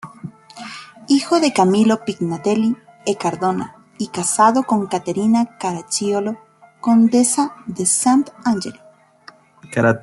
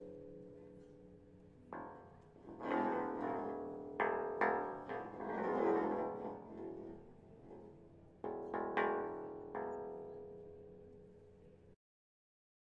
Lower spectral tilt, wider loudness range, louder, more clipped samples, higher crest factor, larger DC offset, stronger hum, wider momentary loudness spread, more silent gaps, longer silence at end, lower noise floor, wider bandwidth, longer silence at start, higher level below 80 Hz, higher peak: second, -4.5 dB/octave vs -8 dB/octave; second, 2 LU vs 7 LU; first, -18 LUFS vs -41 LUFS; neither; second, 16 dB vs 22 dB; neither; neither; second, 19 LU vs 24 LU; neither; second, 0 s vs 1 s; second, -47 dBFS vs -62 dBFS; first, 12 kHz vs 7.4 kHz; about the same, 0.05 s vs 0 s; first, -62 dBFS vs -74 dBFS; first, -2 dBFS vs -22 dBFS